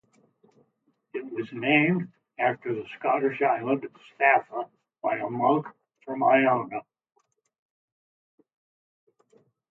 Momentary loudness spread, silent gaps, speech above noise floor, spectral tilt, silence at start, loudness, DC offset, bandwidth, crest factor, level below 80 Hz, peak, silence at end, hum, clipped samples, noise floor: 17 LU; none; 47 dB; -8.5 dB/octave; 1.15 s; -25 LUFS; under 0.1%; 4.2 kHz; 22 dB; -78 dBFS; -6 dBFS; 2.9 s; none; under 0.1%; -72 dBFS